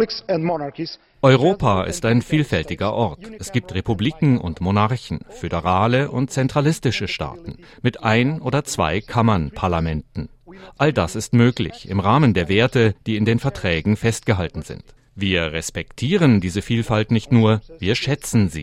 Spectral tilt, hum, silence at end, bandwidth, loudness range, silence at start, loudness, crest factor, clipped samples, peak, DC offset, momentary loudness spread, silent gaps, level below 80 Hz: -6 dB/octave; none; 0 s; 13.5 kHz; 3 LU; 0 s; -20 LUFS; 18 dB; under 0.1%; 0 dBFS; under 0.1%; 11 LU; none; -42 dBFS